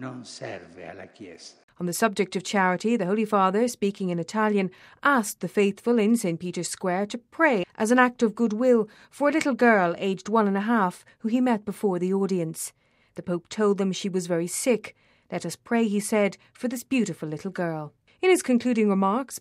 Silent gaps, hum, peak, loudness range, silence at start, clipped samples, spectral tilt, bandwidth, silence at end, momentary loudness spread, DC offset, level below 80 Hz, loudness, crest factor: 1.63-1.68 s; none; -6 dBFS; 5 LU; 0 s; under 0.1%; -5 dB/octave; 15.5 kHz; 0 s; 14 LU; under 0.1%; -72 dBFS; -25 LUFS; 20 dB